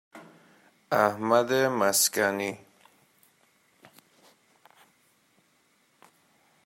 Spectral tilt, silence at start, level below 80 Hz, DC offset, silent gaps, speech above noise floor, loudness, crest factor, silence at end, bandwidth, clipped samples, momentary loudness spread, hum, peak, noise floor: -2.5 dB/octave; 0.15 s; -78 dBFS; under 0.1%; none; 42 dB; -25 LUFS; 24 dB; 4.1 s; 16 kHz; under 0.1%; 11 LU; none; -8 dBFS; -67 dBFS